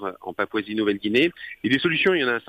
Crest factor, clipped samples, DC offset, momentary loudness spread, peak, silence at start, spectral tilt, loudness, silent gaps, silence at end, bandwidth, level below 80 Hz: 16 dB; under 0.1%; under 0.1%; 9 LU; -8 dBFS; 0 s; -6 dB/octave; -23 LUFS; none; 0.1 s; 15.5 kHz; -62 dBFS